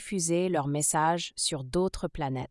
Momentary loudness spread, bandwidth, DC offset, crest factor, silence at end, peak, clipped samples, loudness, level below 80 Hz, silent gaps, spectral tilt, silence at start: 8 LU; 12 kHz; under 0.1%; 16 dB; 0.05 s; -14 dBFS; under 0.1%; -28 LUFS; -50 dBFS; none; -4 dB/octave; 0 s